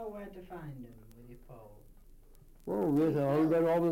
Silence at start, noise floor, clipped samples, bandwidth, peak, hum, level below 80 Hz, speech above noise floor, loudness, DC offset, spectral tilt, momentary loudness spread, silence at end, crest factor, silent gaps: 0 s; -56 dBFS; under 0.1%; 17 kHz; -20 dBFS; none; -58 dBFS; 24 dB; -30 LUFS; under 0.1%; -9 dB/octave; 25 LU; 0 s; 14 dB; none